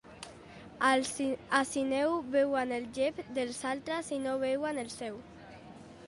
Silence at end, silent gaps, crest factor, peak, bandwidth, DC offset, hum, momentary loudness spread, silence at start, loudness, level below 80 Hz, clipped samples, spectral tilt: 0 s; none; 22 dB; -12 dBFS; 11.5 kHz; under 0.1%; none; 21 LU; 0.05 s; -32 LUFS; -66 dBFS; under 0.1%; -3.5 dB/octave